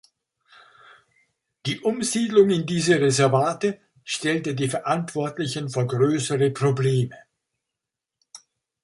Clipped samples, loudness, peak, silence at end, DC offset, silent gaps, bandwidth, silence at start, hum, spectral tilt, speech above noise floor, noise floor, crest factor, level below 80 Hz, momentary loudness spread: under 0.1%; -23 LUFS; -4 dBFS; 0.45 s; under 0.1%; none; 11.5 kHz; 1.65 s; none; -5 dB/octave; 64 dB; -86 dBFS; 20 dB; -64 dBFS; 10 LU